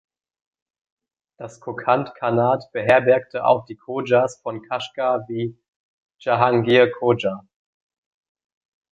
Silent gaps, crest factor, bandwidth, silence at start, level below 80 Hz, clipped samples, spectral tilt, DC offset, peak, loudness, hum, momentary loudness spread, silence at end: 5.68-6.09 s; 20 dB; 8 kHz; 1.4 s; -62 dBFS; under 0.1%; -6.5 dB/octave; under 0.1%; -2 dBFS; -20 LUFS; none; 15 LU; 1.5 s